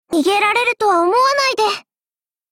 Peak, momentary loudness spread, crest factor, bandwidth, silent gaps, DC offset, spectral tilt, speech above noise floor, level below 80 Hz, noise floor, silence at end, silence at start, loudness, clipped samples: -4 dBFS; 5 LU; 12 dB; 17 kHz; none; under 0.1%; -1.5 dB/octave; over 75 dB; -60 dBFS; under -90 dBFS; 0.7 s; 0.1 s; -15 LUFS; under 0.1%